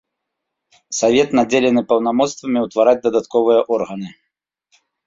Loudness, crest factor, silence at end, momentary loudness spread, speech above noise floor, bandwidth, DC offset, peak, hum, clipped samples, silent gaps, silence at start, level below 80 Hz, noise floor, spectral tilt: -16 LUFS; 16 dB; 0.95 s; 10 LU; 63 dB; 7.8 kHz; under 0.1%; -2 dBFS; none; under 0.1%; none; 0.9 s; -60 dBFS; -78 dBFS; -4.5 dB/octave